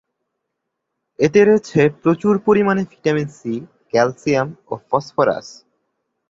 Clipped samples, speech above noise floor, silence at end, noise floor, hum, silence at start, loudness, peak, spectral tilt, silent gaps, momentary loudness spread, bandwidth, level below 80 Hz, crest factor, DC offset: under 0.1%; 60 dB; 0.75 s; -77 dBFS; none; 1.2 s; -18 LUFS; -2 dBFS; -6.5 dB/octave; none; 13 LU; 7.8 kHz; -58 dBFS; 16 dB; under 0.1%